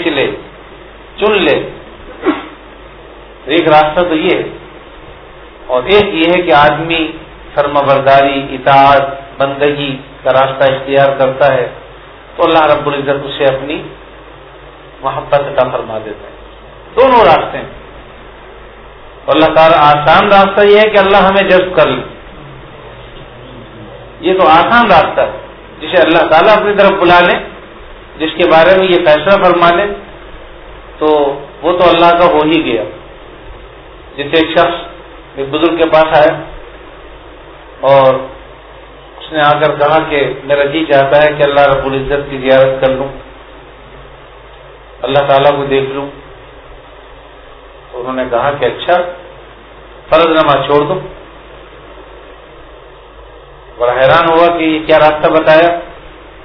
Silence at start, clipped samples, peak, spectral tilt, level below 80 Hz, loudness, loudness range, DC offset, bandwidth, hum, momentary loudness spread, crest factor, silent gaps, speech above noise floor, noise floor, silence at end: 0 s; 0.9%; 0 dBFS; -7.5 dB/octave; -38 dBFS; -10 LUFS; 7 LU; under 0.1%; 5.4 kHz; none; 22 LU; 12 dB; none; 26 dB; -35 dBFS; 0.2 s